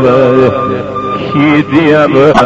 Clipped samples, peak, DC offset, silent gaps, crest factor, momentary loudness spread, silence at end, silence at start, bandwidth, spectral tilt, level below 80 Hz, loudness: 2%; 0 dBFS; under 0.1%; none; 8 dB; 9 LU; 0 s; 0 s; 8 kHz; -7.5 dB/octave; -38 dBFS; -9 LUFS